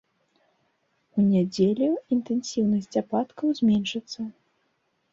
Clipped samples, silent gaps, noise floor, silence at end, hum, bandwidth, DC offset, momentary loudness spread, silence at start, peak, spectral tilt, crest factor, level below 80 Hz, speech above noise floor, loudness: under 0.1%; none; -72 dBFS; 0.8 s; none; 7.8 kHz; under 0.1%; 10 LU; 1.15 s; -10 dBFS; -6.5 dB/octave; 16 dB; -64 dBFS; 48 dB; -25 LUFS